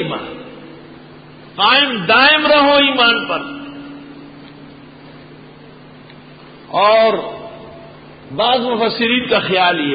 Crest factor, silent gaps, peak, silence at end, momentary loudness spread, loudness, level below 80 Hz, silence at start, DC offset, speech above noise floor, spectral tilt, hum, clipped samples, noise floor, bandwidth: 16 dB; none; 0 dBFS; 0 s; 23 LU; -13 LUFS; -52 dBFS; 0 s; under 0.1%; 26 dB; -9 dB/octave; none; under 0.1%; -39 dBFS; 5 kHz